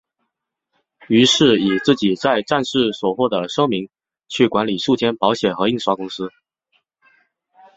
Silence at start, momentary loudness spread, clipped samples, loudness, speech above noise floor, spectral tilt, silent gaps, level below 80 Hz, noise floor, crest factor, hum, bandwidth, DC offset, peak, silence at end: 1.1 s; 11 LU; under 0.1%; -17 LUFS; 60 dB; -4.5 dB/octave; none; -58 dBFS; -78 dBFS; 18 dB; none; 8.2 kHz; under 0.1%; -2 dBFS; 1.45 s